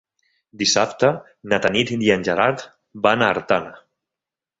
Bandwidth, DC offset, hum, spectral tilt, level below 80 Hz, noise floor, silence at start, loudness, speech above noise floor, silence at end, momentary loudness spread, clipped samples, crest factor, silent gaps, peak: 8 kHz; under 0.1%; none; -3.5 dB/octave; -56 dBFS; -88 dBFS; 0.55 s; -19 LUFS; 68 dB; 0.8 s; 12 LU; under 0.1%; 20 dB; none; -2 dBFS